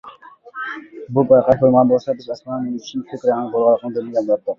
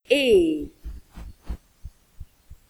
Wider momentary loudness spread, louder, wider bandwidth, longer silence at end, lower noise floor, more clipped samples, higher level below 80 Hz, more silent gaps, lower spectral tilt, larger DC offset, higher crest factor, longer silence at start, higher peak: second, 15 LU vs 26 LU; about the same, -18 LUFS vs -20 LUFS; second, 6.8 kHz vs 15 kHz; about the same, 0.05 s vs 0.15 s; second, -41 dBFS vs -45 dBFS; neither; second, -54 dBFS vs -42 dBFS; neither; first, -8 dB/octave vs -5 dB/octave; neither; about the same, 16 dB vs 20 dB; about the same, 0.05 s vs 0.1 s; first, -2 dBFS vs -6 dBFS